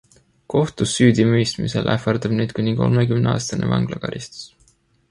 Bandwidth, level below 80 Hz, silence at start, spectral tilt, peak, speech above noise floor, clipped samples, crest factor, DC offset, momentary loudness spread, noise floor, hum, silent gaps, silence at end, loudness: 11.5 kHz; -46 dBFS; 0.5 s; -6 dB/octave; -2 dBFS; 40 dB; under 0.1%; 18 dB; under 0.1%; 13 LU; -58 dBFS; none; none; 0.65 s; -19 LUFS